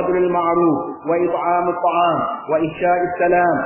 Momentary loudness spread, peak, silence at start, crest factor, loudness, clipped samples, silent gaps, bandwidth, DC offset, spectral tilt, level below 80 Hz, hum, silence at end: 5 LU; -6 dBFS; 0 s; 12 dB; -18 LUFS; under 0.1%; none; 3.2 kHz; under 0.1%; -10.5 dB/octave; -54 dBFS; none; 0 s